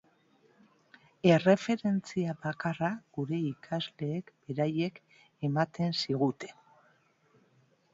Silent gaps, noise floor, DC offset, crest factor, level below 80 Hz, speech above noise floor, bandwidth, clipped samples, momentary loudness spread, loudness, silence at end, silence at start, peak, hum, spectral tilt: none; -68 dBFS; under 0.1%; 22 dB; -72 dBFS; 37 dB; 7.8 kHz; under 0.1%; 12 LU; -31 LUFS; 1.45 s; 1.25 s; -10 dBFS; none; -6.5 dB/octave